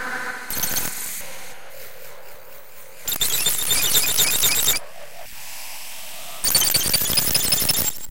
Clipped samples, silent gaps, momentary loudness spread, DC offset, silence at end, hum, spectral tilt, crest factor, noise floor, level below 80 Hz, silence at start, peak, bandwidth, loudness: under 0.1%; none; 23 LU; 3%; 0 s; none; 0 dB/octave; 20 dB; -44 dBFS; -48 dBFS; 0 s; -4 dBFS; 17.5 kHz; -19 LUFS